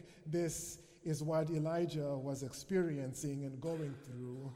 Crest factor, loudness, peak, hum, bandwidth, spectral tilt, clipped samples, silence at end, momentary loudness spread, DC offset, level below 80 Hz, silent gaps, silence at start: 14 dB; -40 LUFS; -24 dBFS; none; 16 kHz; -6 dB/octave; under 0.1%; 0 s; 10 LU; under 0.1%; -68 dBFS; none; 0 s